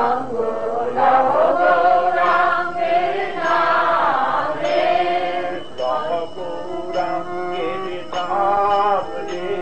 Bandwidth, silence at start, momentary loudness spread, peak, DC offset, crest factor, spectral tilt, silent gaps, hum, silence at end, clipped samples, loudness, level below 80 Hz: 8.8 kHz; 0 s; 11 LU; -4 dBFS; 3%; 14 dB; -5 dB/octave; none; none; 0 s; under 0.1%; -19 LUFS; -56 dBFS